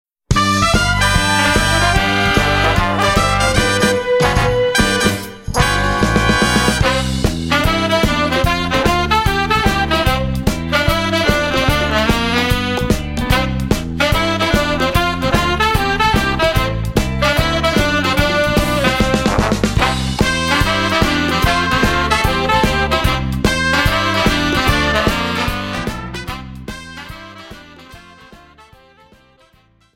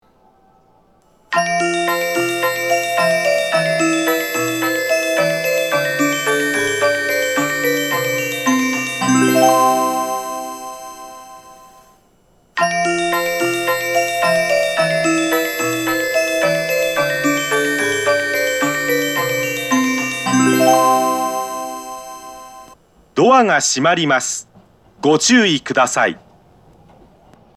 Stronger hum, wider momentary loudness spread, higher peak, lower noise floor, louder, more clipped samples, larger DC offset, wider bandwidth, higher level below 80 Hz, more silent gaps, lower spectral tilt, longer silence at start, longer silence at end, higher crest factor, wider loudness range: neither; second, 5 LU vs 12 LU; about the same, 0 dBFS vs 0 dBFS; about the same, -53 dBFS vs -55 dBFS; about the same, -15 LUFS vs -16 LUFS; neither; neither; about the same, 16.5 kHz vs 15 kHz; first, -24 dBFS vs -58 dBFS; neither; first, -4.5 dB/octave vs -3 dB/octave; second, 0.3 s vs 1.3 s; first, 1.6 s vs 1.4 s; about the same, 14 dB vs 18 dB; about the same, 4 LU vs 3 LU